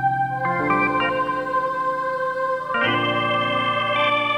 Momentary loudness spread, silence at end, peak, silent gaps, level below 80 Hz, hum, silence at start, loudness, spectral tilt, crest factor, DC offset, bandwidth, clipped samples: 4 LU; 0 s; -8 dBFS; none; -56 dBFS; none; 0 s; -21 LUFS; -6 dB/octave; 14 dB; under 0.1%; 12 kHz; under 0.1%